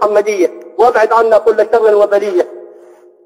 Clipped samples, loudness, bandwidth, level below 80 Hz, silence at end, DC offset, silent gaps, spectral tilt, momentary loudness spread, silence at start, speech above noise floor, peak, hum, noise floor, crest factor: under 0.1%; -11 LUFS; 15.5 kHz; -56 dBFS; 0.6 s; under 0.1%; none; -4 dB/octave; 7 LU; 0 s; 30 dB; 0 dBFS; none; -41 dBFS; 12 dB